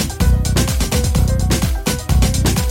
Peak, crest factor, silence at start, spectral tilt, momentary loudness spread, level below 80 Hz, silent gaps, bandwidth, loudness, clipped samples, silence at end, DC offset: -2 dBFS; 14 dB; 0 s; -5 dB/octave; 2 LU; -18 dBFS; none; 17 kHz; -17 LUFS; under 0.1%; 0 s; under 0.1%